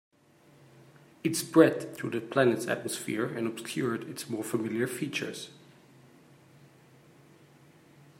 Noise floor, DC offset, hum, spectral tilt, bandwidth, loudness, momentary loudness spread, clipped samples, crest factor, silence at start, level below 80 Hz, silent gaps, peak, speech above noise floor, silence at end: -61 dBFS; under 0.1%; none; -5 dB/octave; 16 kHz; -30 LUFS; 13 LU; under 0.1%; 26 dB; 0.75 s; -78 dBFS; none; -6 dBFS; 31 dB; 2.65 s